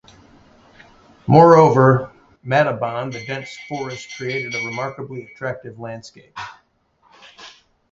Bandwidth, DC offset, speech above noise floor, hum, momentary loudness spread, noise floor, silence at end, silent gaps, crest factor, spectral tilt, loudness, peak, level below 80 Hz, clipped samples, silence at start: 7.6 kHz; under 0.1%; 43 dB; none; 24 LU; -61 dBFS; 0.4 s; none; 20 dB; -7 dB/octave; -17 LUFS; 0 dBFS; -56 dBFS; under 0.1%; 1.25 s